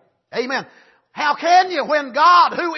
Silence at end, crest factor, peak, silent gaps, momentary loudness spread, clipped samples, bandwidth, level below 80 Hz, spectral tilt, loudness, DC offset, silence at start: 0 s; 14 dB; -2 dBFS; none; 14 LU; under 0.1%; 6.2 kHz; -78 dBFS; -2.5 dB/octave; -16 LUFS; under 0.1%; 0.35 s